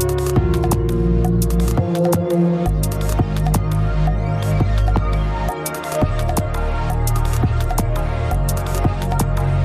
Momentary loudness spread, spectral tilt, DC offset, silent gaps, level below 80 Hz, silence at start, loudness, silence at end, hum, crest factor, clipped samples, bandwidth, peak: 4 LU; -6.5 dB/octave; under 0.1%; none; -22 dBFS; 0 s; -19 LUFS; 0 s; none; 14 dB; under 0.1%; 16 kHz; -4 dBFS